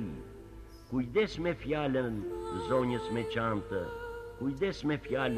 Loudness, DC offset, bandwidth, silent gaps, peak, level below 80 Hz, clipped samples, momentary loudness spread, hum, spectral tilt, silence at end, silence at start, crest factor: -34 LUFS; under 0.1%; 14 kHz; none; -16 dBFS; -52 dBFS; under 0.1%; 13 LU; none; -7 dB/octave; 0 s; 0 s; 18 dB